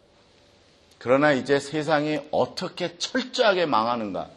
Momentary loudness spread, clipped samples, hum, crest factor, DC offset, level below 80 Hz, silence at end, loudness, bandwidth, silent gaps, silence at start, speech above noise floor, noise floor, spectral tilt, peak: 9 LU; under 0.1%; none; 20 dB; under 0.1%; -66 dBFS; 0.05 s; -24 LUFS; 11.5 kHz; none; 1 s; 34 dB; -57 dBFS; -4.5 dB/octave; -6 dBFS